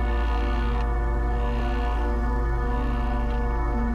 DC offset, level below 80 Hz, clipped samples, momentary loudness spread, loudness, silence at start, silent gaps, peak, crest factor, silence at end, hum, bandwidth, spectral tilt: under 0.1%; -24 dBFS; under 0.1%; 1 LU; -27 LUFS; 0 s; none; -16 dBFS; 8 dB; 0 s; none; 5.2 kHz; -8 dB/octave